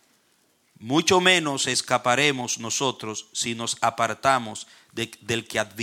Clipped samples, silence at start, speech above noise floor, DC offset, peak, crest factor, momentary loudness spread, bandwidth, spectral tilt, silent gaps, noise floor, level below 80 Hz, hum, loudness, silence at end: under 0.1%; 0.8 s; 41 dB; under 0.1%; -4 dBFS; 22 dB; 14 LU; 17 kHz; -2.5 dB/octave; none; -65 dBFS; -64 dBFS; none; -23 LUFS; 0 s